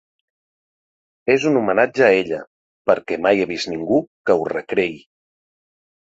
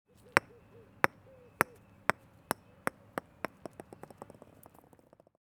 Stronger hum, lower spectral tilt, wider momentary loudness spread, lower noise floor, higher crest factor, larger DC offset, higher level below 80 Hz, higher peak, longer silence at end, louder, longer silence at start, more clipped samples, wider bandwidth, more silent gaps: neither; first, -5.5 dB/octave vs -3.5 dB/octave; second, 10 LU vs 22 LU; first, under -90 dBFS vs -62 dBFS; second, 20 dB vs 38 dB; neither; first, -60 dBFS vs -72 dBFS; about the same, 0 dBFS vs -2 dBFS; second, 1.15 s vs 5.1 s; first, -19 LUFS vs -35 LUFS; first, 1.25 s vs 0.35 s; neither; second, 8 kHz vs over 20 kHz; first, 2.47-2.85 s, 4.07-4.24 s vs none